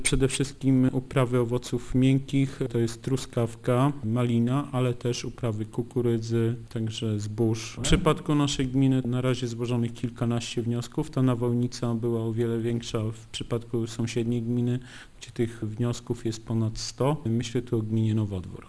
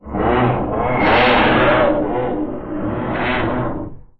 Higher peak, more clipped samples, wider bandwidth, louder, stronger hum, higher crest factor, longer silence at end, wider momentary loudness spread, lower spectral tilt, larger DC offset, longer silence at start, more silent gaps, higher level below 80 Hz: second, -6 dBFS vs -2 dBFS; neither; first, 11 kHz vs 6 kHz; second, -27 LUFS vs -17 LUFS; neither; first, 20 dB vs 14 dB; second, 0 s vs 0.2 s; second, 7 LU vs 12 LU; second, -6 dB/octave vs -8.5 dB/octave; neither; about the same, 0 s vs 0.05 s; neither; second, -44 dBFS vs -34 dBFS